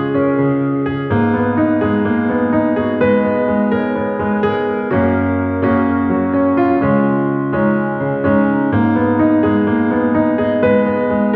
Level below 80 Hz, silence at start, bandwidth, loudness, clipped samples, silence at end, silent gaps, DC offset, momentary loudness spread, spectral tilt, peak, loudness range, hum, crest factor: -44 dBFS; 0 s; 4.6 kHz; -15 LUFS; under 0.1%; 0 s; none; under 0.1%; 4 LU; -11 dB/octave; -2 dBFS; 1 LU; none; 12 dB